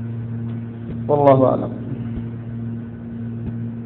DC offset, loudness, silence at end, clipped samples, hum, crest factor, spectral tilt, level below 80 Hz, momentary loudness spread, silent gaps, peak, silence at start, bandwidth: under 0.1%; -22 LUFS; 0 s; under 0.1%; none; 22 dB; -12 dB/octave; -44 dBFS; 16 LU; none; 0 dBFS; 0 s; 4 kHz